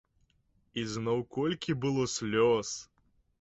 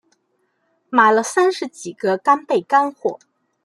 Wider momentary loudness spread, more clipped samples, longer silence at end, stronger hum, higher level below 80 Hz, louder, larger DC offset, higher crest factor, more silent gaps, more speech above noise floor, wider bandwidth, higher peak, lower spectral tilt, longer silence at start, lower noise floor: about the same, 12 LU vs 13 LU; neither; about the same, 0.6 s vs 0.5 s; neither; first, -64 dBFS vs -74 dBFS; second, -31 LUFS vs -18 LUFS; neither; about the same, 16 dB vs 18 dB; neither; second, 41 dB vs 50 dB; second, 8.2 kHz vs 12.5 kHz; second, -16 dBFS vs -2 dBFS; first, -5 dB/octave vs -3.5 dB/octave; second, 0.75 s vs 0.9 s; about the same, -71 dBFS vs -68 dBFS